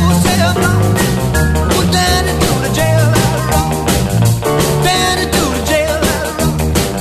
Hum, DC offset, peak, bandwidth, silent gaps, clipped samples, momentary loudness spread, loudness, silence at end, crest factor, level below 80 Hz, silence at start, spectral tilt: none; under 0.1%; 0 dBFS; 14 kHz; none; under 0.1%; 3 LU; -13 LUFS; 0 s; 12 dB; -22 dBFS; 0 s; -4.5 dB/octave